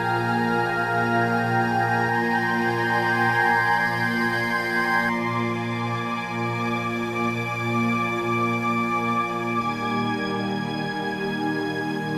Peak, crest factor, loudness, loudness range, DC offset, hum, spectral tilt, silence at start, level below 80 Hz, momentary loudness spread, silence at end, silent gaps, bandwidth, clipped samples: -10 dBFS; 14 dB; -23 LUFS; 4 LU; under 0.1%; none; -6 dB/octave; 0 s; -58 dBFS; 6 LU; 0 s; none; 15.5 kHz; under 0.1%